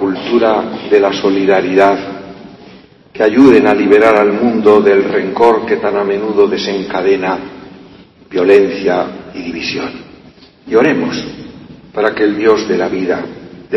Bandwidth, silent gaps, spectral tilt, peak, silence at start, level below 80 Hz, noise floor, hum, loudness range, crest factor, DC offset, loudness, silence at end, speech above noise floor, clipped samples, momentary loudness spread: 7.2 kHz; none; -6 dB/octave; 0 dBFS; 0 s; -50 dBFS; -41 dBFS; none; 7 LU; 12 dB; under 0.1%; -12 LUFS; 0 s; 30 dB; 0.1%; 17 LU